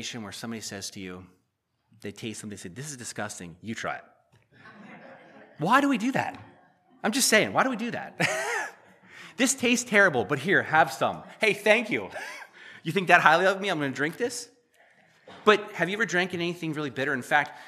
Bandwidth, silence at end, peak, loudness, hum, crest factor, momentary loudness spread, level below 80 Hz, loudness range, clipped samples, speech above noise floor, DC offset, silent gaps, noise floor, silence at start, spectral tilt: 15 kHz; 0 s; 0 dBFS; -25 LUFS; none; 26 dB; 18 LU; -74 dBFS; 14 LU; under 0.1%; 50 dB; under 0.1%; none; -76 dBFS; 0 s; -3.5 dB/octave